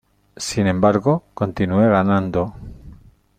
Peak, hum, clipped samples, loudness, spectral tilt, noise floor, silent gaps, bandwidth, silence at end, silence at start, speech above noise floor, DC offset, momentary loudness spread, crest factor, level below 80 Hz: -2 dBFS; none; under 0.1%; -19 LUFS; -6.5 dB/octave; -45 dBFS; none; 14.5 kHz; 0.45 s; 0.4 s; 27 dB; under 0.1%; 13 LU; 18 dB; -46 dBFS